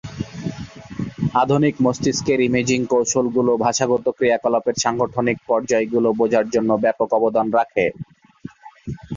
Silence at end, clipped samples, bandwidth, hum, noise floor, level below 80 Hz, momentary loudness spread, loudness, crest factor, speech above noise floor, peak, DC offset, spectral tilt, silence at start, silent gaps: 0 s; under 0.1%; 7.6 kHz; none; -40 dBFS; -50 dBFS; 14 LU; -19 LUFS; 16 dB; 22 dB; -4 dBFS; under 0.1%; -5 dB/octave; 0.05 s; none